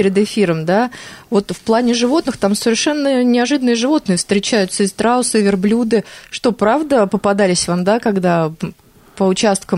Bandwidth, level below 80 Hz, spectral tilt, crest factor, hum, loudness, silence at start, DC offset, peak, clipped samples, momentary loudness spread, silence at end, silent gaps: 15 kHz; -50 dBFS; -4.5 dB/octave; 12 dB; none; -15 LUFS; 0 s; under 0.1%; -4 dBFS; under 0.1%; 5 LU; 0 s; none